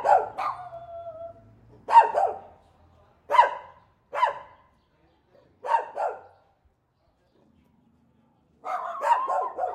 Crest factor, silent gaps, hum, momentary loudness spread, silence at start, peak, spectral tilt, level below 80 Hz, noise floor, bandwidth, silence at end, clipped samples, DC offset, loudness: 24 dB; none; none; 23 LU; 0 s; -4 dBFS; -3 dB/octave; -70 dBFS; -69 dBFS; 10 kHz; 0 s; under 0.1%; under 0.1%; -24 LUFS